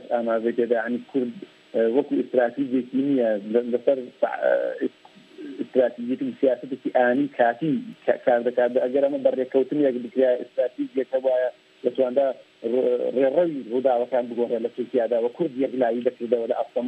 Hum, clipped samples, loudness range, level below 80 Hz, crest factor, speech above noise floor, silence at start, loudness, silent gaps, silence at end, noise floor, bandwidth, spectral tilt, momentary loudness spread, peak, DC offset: none; under 0.1%; 2 LU; -80 dBFS; 18 dB; 20 dB; 0 s; -24 LUFS; none; 0 s; -43 dBFS; 8.2 kHz; -8 dB/octave; 7 LU; -4 dBFS; under 0.1%